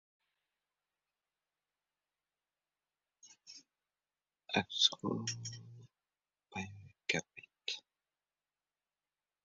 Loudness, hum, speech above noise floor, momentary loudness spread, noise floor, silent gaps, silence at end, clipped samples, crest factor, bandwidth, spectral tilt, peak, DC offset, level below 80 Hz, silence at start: -37 LUFS; 50 Hz at -70 dBFS; over 54 dB; 25 LU; under -90 dBFS; none; 1.65 s; under 0.1%; 30 dB; 7.4 kHz; -1.5 dB/octave; -16 dBFS; under 0.1%; -76 dBFS; 3.25 s